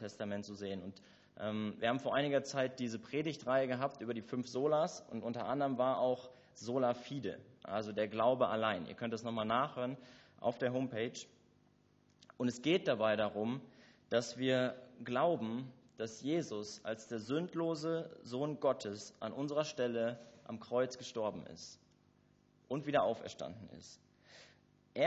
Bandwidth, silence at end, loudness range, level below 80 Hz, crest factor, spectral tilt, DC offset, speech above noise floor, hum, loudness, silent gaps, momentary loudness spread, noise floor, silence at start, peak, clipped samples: 8 kHz; 0 s; 4 LU; -76 dBFS; 20 dB; -4.5 dB/octave; under 0.1%; 33 dB; 50 Hz at -75 dBFS; -38 LUFS; none; 14 LU; -71 dBFS; 0 s; -18 dBFS; under 0.1%